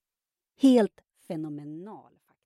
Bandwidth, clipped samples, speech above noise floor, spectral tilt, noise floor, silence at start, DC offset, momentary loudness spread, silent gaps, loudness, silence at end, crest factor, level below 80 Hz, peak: 12 kHz; under 0.1%; over 64 dB; -6.5 dB/octave; under -90 dBFS; 0.6 s; under 0.1%; 21 LU; none; -25 LUFS; 0.5 s; 18 dB; -80 dBFS; -10 dBFS